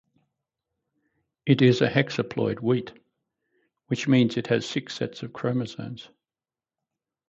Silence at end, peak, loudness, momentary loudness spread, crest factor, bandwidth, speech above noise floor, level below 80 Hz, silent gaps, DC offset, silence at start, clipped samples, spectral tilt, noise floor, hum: 1.25 s; -6 dBFS; -25 LUFS; 15 LU; 22 dB; 7.8 kHz; over 66 dB; -66 dBFS; none; under 0.1%; 1.45 s; under 0.1%; -6.5 dB/octave; under -90 dBFS; none